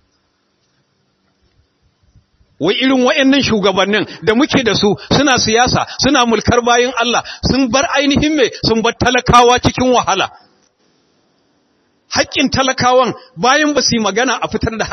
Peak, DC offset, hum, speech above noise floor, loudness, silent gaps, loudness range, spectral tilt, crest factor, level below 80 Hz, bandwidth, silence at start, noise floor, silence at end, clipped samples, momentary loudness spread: 0 dBFS; under 0.1%; none; 49 dB; -13 LUFS; none; 5 LU; -3.5 dB/octave; 14 dB; -38 dBFS; 10.5 kHz; 2.6 s; -62 dBFS; 0 s; under 0.1%; 6 LU